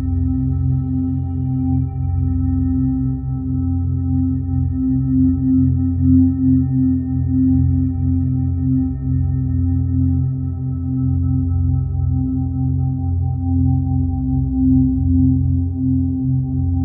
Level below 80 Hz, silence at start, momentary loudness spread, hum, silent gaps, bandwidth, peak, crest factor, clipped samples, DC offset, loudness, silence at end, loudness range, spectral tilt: -28 dBFS; 0 s; 5 LU; none; none; 1.9 kHz; -2 dBFS; 14 dB; under 0.1%; under 0.1%; -18 LUFS; 0 s; 3 LU; -16.5 dB/octave